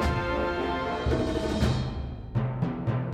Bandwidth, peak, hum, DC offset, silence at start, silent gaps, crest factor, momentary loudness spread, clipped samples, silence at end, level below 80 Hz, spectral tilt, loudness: 12.5 kHz; -14 dBFS; none; under 0.1%; 0 s; none; 14 dB; 5 LU; under 0.1%; 0 s; -36 dBFS; -7 dB/octave; -29 LUFS